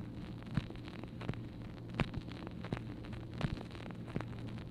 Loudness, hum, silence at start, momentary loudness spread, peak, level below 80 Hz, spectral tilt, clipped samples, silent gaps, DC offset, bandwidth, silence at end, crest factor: -44 LUFS; none; 0 s; 7 LU; -16 dBFS; -52 dBFS; -7.5 dB/octave; under 0.1%; none; under 0.1%; 11.5 kHz; 0 s; 26 dB